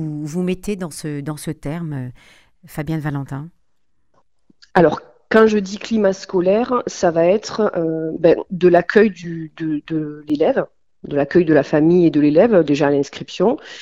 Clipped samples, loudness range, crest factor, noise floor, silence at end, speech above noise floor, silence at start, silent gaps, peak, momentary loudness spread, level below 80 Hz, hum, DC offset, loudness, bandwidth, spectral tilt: under 0.1%; 11 LU; 18 dB; -72 dBFS; 0 s; 55 dB; 0 s; none; 0 dBFS; 14 LU; -48 dBFS; none; 0.1%; -17 LUFS; 15 kHz; -6.5 dB/octave